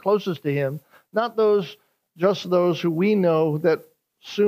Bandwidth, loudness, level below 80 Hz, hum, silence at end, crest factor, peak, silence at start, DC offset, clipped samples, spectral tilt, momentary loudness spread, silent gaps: 15.5 kHz; -22 LUFS; -76 dBFS; none; 0 s; 16 dB; -6 dBFS; 0.05 s; under 0.1%; under 0.1%; -7.5 dB/octave; 9 LU; none